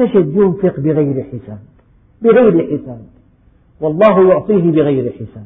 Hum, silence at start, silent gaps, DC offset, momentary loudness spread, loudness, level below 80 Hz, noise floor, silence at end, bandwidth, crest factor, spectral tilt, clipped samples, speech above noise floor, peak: none; 0 s; none; under 0.1%; 15 LU; -13 LUFS; -48 dBFS; -49 dBFS; 0 s; 3.9 kHz; 14 dB; -11 dB/octave; under 0.1%; 37 dB; 0 dBFS